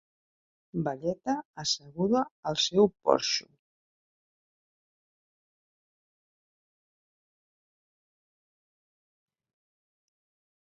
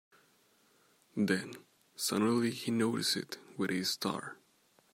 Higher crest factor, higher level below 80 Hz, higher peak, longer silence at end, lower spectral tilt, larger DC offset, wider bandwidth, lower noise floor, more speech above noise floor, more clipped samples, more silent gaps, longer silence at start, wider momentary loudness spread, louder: first, 28 dB vs 20 dB; first, -70 dBFS vs -80 dBFS; first, -6 dBFS vs -16 dBFS; first, 7.2 s vs 0.6 s; about the same, -4 dB/octave vs -4 dB/octave; neither; second, 7.8 kHz vs 16 kHz; first, under -90 dBFS vs -69 dBFS; first, over 62 dB vs 36 dB; neither; first, 1.45-1.54 s, 2.31-2.43 s vs none; second, 0.75 s vs 1.15 s; second, 9 LU vs 16 LU; first, -28 LUFS vs -34 LUFS